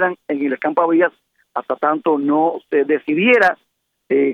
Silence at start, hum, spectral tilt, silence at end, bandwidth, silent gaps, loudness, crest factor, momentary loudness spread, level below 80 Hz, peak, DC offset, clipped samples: 0 s; none; -7 dB/octave; 0 s; 7.8 kHz; none; -17 LUFS; 16 dB; 9 LU; -70 dBFS; -2 dBFS; under 0.1%; under 0.1%